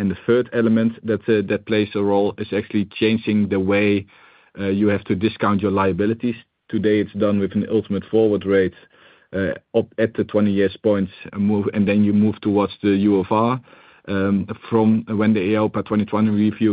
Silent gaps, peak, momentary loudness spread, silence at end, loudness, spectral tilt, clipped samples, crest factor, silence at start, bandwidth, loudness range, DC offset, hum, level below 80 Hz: none; -4 dBFS; 6 LU; 0 s; -20 LUFS; -12 dB/octave; under 0.1%; 16 dB; 0 s; 4.9 kHz; 2 LU; under 0.1%; none; -58 dBFS